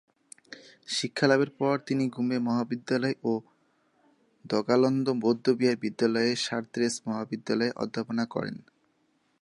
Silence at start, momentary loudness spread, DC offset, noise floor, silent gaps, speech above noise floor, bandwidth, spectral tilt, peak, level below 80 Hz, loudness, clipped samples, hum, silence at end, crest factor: 0.5 s; 10 LU; under 0.1%; -71 dBFS; none; 43 dB; 11.5 kHz; -5 dB/octave; -8 dBFS; -74 dBFS; -28 LUFS; under 0.1%; none; 0.85 s; 22 dB